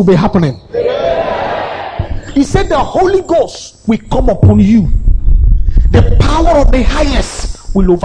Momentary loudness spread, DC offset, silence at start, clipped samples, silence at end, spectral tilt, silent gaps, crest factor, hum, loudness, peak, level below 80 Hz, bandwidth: 10 LU; under 0.1%; 0 s; 0.6%; 0 s; -7 dB/octave; none; 10 dB; none; -12 LUFS; 0 dBFS; -14 dBFS; 9.8 kHz